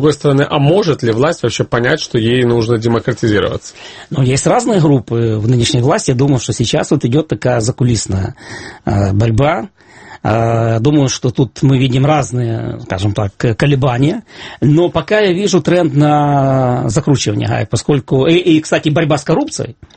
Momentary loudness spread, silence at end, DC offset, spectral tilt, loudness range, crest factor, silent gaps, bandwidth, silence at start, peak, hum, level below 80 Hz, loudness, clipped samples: 8 LU; 0.25 s; under 0.1%; -6 dB/octave; 2 LU; 12 dB; none; 8.8 kHz; 0 s; 0 dBFS; none; -38 dBFS; -13 LUFS; under 0.1%